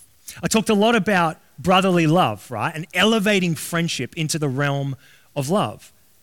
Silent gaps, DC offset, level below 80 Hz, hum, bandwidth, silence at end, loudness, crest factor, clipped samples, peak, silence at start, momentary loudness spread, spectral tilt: none; 0.2%; -56 dBFS; none; 18 kHz; 0.35 s; -20 LUFS; 16 dB; under 0.1%; -4 dBFS; 0.3 s; 11 LU; -4.5 dB/octave